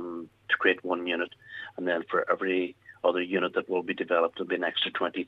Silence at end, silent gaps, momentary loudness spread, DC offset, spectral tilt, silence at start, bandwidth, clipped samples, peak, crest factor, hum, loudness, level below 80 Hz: 0 s; none; 10 LU; under 0.1%; -6 dB/octave; 0 s; 5.4 kHz; under 0.1%; -10 dBFS; 20 dB; none; -28 LUFS; -76 dBFS